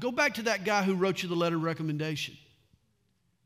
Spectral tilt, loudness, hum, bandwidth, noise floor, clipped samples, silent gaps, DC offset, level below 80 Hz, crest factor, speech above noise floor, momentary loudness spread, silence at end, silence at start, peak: -5 dB/octave; -29 LUFS; none; 16 kHz; -74 dBFS; under 0.1%; none; under 0.1%; -72 dBFS; 18 dB; 44 dB; 6 LU; 1.1 s; 0 s; -12 dBFS